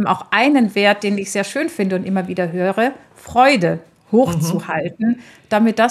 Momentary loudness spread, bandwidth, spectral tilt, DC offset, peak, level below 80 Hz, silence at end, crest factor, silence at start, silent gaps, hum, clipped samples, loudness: 8 LU; 14 kHz; -5.5 dB/octave; under 0.1%; 0 dBFS; -56 dBFS; 0 s; 16 dB; 0 s; none; none; under 0.1%; -17 LUFS